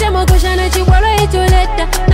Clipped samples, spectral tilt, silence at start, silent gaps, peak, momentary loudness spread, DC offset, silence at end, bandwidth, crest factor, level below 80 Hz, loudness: under 0.1%; -5 dB/octave; 0 s; none; 0 dBFS; 3 LU; under 0.1%; 0 s; 16.5 kHz; 10 dB; -12 dBFS; -12 LUFS